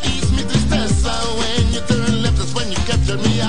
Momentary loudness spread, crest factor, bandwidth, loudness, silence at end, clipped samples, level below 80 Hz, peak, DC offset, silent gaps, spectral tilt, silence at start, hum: 3 LU; 16 dB; 10.5 kHz; -18 LUFS; 0 s; under 0.1%; -24 dBFS; -2 dBFS; 8%; none; -5 dB/octave; 0 s; none